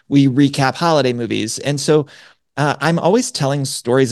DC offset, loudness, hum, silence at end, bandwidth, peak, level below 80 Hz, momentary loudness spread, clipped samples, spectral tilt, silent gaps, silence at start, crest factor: under 0.1%; -16 LUFS; none; 0 s; 12.5 kHz; 0 dBFS; -58 dBFS; 6 LU; under 0.1%; -5.5 dB/octave; none; 0.1 s; 16 dB